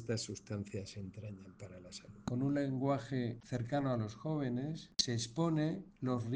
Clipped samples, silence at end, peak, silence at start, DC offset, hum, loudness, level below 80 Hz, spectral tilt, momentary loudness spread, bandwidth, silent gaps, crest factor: under 0.1%; 0 s; -16 dBFS; 0 s; under 0.1%; none; -38 LUFS; -66 dBFS; -5.5 dB/octave; 15 LU; 10 kHz; none; 22 dB